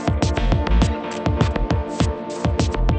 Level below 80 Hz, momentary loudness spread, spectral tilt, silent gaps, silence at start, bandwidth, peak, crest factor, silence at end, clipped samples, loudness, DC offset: -24 dBFS; 4 LU; -6.5 dB/octave; none; 0 s; 8.8 kHz; -2 dBFS; 16 dB; 0 s; under 0.1%; -21 LUFS; under 0.1%